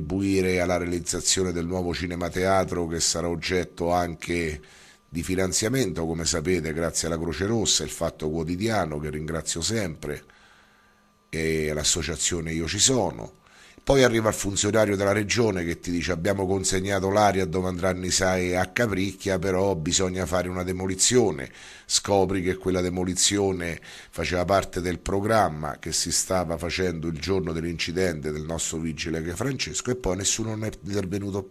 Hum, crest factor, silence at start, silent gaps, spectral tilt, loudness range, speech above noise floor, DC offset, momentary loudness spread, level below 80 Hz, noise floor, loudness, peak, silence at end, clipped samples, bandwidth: none; 22 dB; 0 s; none; -3.5 dB/octave; 4 LU; 35 dB; under 0.1%; 9 LU; -44 dBFS; -60 dBFS; -25 LUFS; -2 dBFS; 0 s; under 0.1%; 14.5 kHz